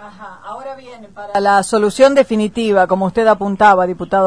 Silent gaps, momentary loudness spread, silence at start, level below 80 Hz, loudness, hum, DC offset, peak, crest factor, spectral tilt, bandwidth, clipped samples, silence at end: none; 21 LU; 0 s; -48 dBFS; -13 LUFS; none; 0.4%; 0 dBFS; 14 dB; -5 dB/octave; 10.5 kHz; under 0.1%; 0 s